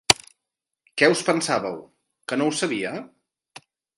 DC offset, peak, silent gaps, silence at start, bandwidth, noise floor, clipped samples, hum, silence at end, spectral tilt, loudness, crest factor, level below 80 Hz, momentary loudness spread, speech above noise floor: under 0.1%; 0 dBFS; none; 0.1 s; 16 kHz; -84 dBFS; under 0.1%; none; 0.9 s; -3 dB/octave; -23 LUFS; 26 dB; -60 dBFS; 17 LU; 62 dB